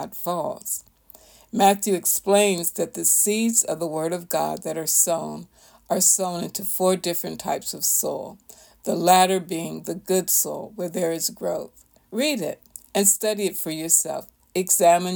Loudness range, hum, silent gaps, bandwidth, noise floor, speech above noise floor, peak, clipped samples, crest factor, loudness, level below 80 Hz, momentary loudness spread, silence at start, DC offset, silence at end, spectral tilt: 4 LU; none; none; over 20 kHz; -51 dBFS; 28 dB; -4 dBFS; under 0.1%; 20 dB; -21 LUFS; -64 dBFS; 14 LU; 0 s; under 0.1%; 0 s; -2.5 dB/octave